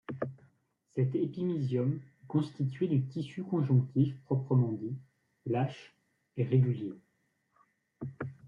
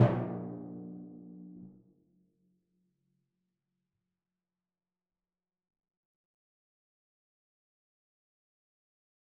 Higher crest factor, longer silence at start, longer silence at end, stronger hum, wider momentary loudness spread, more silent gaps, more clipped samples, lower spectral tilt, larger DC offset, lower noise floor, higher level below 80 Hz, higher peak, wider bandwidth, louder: second, 18 dB vs 30 dB; about the same, 0.1 s vs 0 s; second, 0 s vs 7.55 s; neither; second, 15 LU vs 18 LU; neither; neither; first, -10 dB/octave vs -8 dB/octave; neither; second, -77 dBFS vs under -90 dBFS; about the same, -74 dBFS vs -70 dBFS; second, -14 dBFS vs -10 dBFS; first, 5.6 kHz vs 3.3 kHz; first, -32 LUFS vs -37 LUFS